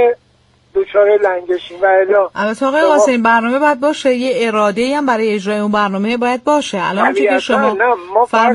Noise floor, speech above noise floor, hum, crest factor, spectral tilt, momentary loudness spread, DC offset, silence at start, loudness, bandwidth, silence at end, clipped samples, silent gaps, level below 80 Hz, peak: -53 dBFS; 40 dB; none; 12 dB; -4.5 dB/octave; 6 LU; under 0.1%; 0 s; -14 LUFS; 11.5 kHz; 0 s; under 0.1%; none; -56 dBFS; 0 dBFS